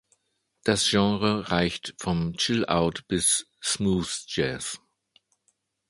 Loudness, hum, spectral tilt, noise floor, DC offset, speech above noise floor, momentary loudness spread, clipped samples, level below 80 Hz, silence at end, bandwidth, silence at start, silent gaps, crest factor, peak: -25 LUFS; none; -3.5 dB/octave; -73 dBFS; under 0.1%; 48 dB; 9 LU; under 0.1%; -50 dBFS; 1.1 s; 11.5 kHz; 0.65 s; none; 20 dB; -6 dBFS